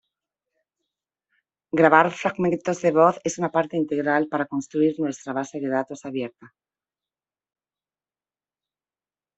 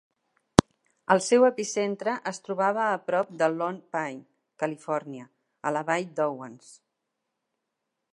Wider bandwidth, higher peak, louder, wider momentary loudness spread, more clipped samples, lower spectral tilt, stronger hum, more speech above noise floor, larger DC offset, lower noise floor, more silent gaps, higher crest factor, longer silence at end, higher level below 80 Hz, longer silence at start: second, 8.2 kHz vs 11.5 kHz; about the same, -2 dBFS vs 0 dBFS; first, -23 LUFS vs -27 LUFS; about the same, 13 LU vs 15 LU; neither; about the same, -6 dB/octave vs -5 dB/octave; neither; first, over 68 dB vs 56 dB; neither; first, under -90 dBFS vs -82 dBFS; neither; about the same, 24 dB vs 28 dB; first, 2.9 s vs 1.4 s; second, -68 dBFS vs -56 dBFS; first, 1.75 s vs 1.1 s